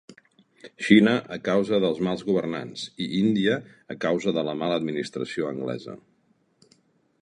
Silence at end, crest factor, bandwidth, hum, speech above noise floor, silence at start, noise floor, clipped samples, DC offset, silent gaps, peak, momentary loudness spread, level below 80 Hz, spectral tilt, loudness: 1.25 s; 24 dB; 10 kHz; none; 42 dB; 0.1 s; -66 dBFS; under 0.1%; under 0.1%; none; -2 dBFS; 14 LU; -66 dBFS; -6 dB/octave; -25 LUFS